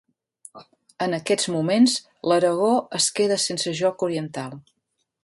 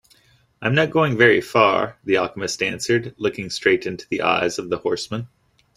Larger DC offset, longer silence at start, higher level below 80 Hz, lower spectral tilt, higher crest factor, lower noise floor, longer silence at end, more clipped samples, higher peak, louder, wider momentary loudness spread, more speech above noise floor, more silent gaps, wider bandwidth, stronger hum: neither; about the same, 0.55 s vs 0.6 s; second, -70 dBFS vs -58 dBFS; about the same, -3.5 dB/octave vs -4.5 dB/octave; about the same, 18 dB vs 20 dB; second, -51 dBFS vs -57 dBFS; first, 0.65 s vs 0.5 s; neither; second, -6 dBFS vs -2 dBFS; about the same, -22 LUFS vs -20 LUFS; about the same, 10 LU vs 11 LU; second, 29 dB vs 37 dB; neither; second, 11.5 kHz vs 13.5 kHz; neither